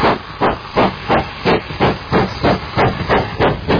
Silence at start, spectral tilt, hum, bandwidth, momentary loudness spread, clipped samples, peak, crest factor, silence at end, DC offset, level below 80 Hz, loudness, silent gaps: 0 s; -7 dB/octave; none; 5.4 kHz; 2 LU; under 0.1%; -2 dBFS; 14 dB; 0 s; under 0.1%; -32 dBFS; -16 LUFS; none